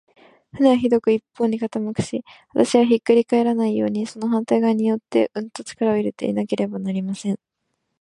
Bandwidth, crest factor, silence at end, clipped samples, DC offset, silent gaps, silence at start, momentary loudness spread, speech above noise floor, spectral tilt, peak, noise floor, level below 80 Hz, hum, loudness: 11 kHz; 18 dB; 0.65 s; under 0.1%; under 0.1%; none; 0.55 s; 10 LU; 55 dB; -6.5 dB/octave; -2 dBFS; -75 dBFS; -60 dBFS; none; -21 LUFS